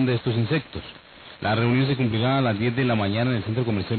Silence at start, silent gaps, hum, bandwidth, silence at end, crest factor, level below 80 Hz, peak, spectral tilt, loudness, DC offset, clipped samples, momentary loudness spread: 0 s; none; none; 4.5 kHz; 0 s; 14 dB; -48 dBFS; -10 dBFS; -11.5 dB/octave; -23 LUFS; under 0.1%; under 0.1%; 8 LU